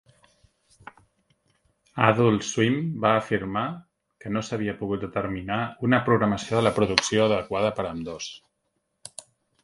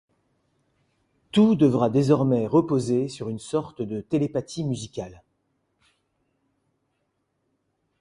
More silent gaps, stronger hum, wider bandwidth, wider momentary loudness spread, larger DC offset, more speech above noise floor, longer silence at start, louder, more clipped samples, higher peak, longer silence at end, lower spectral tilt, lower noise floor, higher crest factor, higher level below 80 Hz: neither; neither; about the same, 11.5 kHz vs 11.5 kHz; first, 18 LU vs 13 LU; neither; about the same, 52 dB vs 52 dB; first, 1.95 s vs 1.35 s; about the same, -24 LUFS vs -23 LUFS; neither; first, 0 dBFS vs -6 dBFS; second, 0.4 s vs 2.85 s; second, -5 dB/octave vs -7.5 dB/octave; about the same, -76 dBFS vs -75 dBFS; first, 26 dB vs 18 dB; first, -54 dBFS vs -60 dBFS